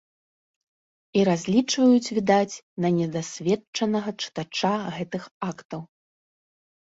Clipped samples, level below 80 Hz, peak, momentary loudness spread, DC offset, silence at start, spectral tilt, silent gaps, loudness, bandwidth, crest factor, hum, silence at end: under 0.1%; -66 dBFS; -6 dBFS; 14 LU; under 0.1%; 1.15 s; -5 dB/octave; 2.63-2.76 s, 3.67-3.73 s, 5.31-5.41 s, 5.65-5.69 s; -24 LUFS; 8 kHz; 20 dB; none; 1 s